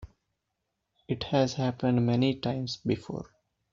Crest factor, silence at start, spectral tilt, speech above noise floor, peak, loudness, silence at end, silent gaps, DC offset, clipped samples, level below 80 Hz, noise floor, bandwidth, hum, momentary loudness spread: 18 dB; 0 s; -6 dB/octave; 54 dB; -12 dBFS; -29 LUFS; 0.5 s; none; under 0.1%; under 0.1%; -58 dBFS; -82 dBFS; 7.6 kHz; none; 13 LU